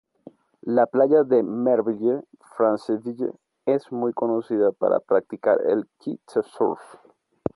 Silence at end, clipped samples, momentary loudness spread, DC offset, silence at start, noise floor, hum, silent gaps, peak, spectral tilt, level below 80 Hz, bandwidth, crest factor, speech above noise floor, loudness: 0.7 s; under 0.1%; 12 LU; under 0.1%; 0.65 s; -50 dBFS; none; none; -6 dBFS; -8.5 dB/octave; -66 dBFS; 11.5 kHz; 16 dB; 27 dB; -23 LUFS